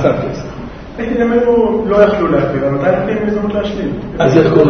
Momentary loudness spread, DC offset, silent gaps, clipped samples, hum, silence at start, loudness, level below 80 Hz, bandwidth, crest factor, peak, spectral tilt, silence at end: 13 LU; under 0.1%; none; 0.1%; none; 0 s; -14 LUFS; -34 dBFS; 6.4 kHz; 12 dB; 0 dBFS; -8 dB/octave; 0 s